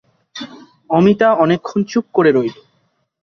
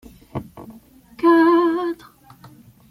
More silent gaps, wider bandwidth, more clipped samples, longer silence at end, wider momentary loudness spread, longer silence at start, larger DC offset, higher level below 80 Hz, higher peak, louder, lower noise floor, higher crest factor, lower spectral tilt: neither; second, 6.8 kHz vs 12 kHz; neither; second, 0.7 s vs 0.95 s; about the same, 19 LU vs 21 LU; about the same, 0.35 s vs 0.35 s; neither; about the same, -58 dBFS vs -56 dBFS; about the same, -2 dBFS vs -4 dBFS; about the same, -15 LUFS vs -17 LUFS; first, -63 dBFS vs -47 dBFS; about the same, 16 dB vs 16 dB; about the same, -7 dB/octave vs -7 dB/octave